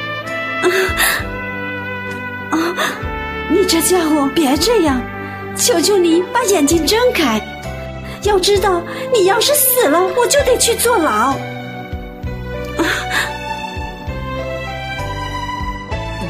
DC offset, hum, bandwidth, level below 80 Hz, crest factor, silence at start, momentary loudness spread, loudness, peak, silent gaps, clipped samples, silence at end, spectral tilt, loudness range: under 0.1%; none; 15.5 kHz; -34 dBFS; 16 dB; 0 s; 14 LU; -15 LUFS; 0 dBFS; none; under 0.1%; 0 s; -3.5 dB/octave; 8 LU